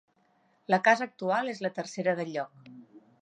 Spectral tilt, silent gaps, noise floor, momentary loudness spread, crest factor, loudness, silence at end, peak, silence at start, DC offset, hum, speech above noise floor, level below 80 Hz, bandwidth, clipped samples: -5 dB/octave; none; -68 dBFS; 13 LU; 22 dB; -29 LUFS; 0.25 s; -8 dBFS; 0.7 s; under 0.1%; none; 40 dB; -84 dBFS; 10 kHz; under 0.1%